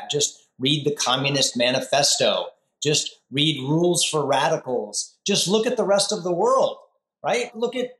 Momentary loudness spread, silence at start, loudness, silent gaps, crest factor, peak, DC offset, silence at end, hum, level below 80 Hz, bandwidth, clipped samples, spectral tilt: 7 LU; 0 s; -21 LUFS; none; 16 dB; -6 dBFS; under 0.1%; 0.05 s; none; -74 dBFS; 13 kHz; under 0.1%; -3 dB/octave